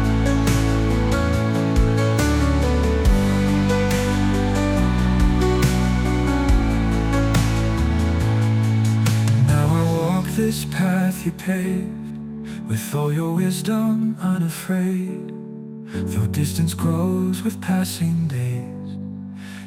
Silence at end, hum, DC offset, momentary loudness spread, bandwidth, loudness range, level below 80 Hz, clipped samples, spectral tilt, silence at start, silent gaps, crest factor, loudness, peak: 0 s; none; under 0.1%; 10 LU; 16.5 kHz; 4 LU; -26 dBFS; under 0.1%; -6.5 dB/octave; 0 s; none; 14 dB; -20 LUFS; -6 dBFS